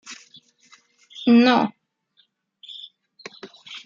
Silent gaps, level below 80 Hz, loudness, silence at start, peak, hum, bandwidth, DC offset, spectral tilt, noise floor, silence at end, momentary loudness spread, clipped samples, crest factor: none; -76 dBFS; -18 LUFS; 0.1 s; -2 dBFS; none; 7.4 kHz; under 0.1%; -5 dB/octave; -65 dBFS; 0.1 s; 27 LU; under 0.1%; 22 dB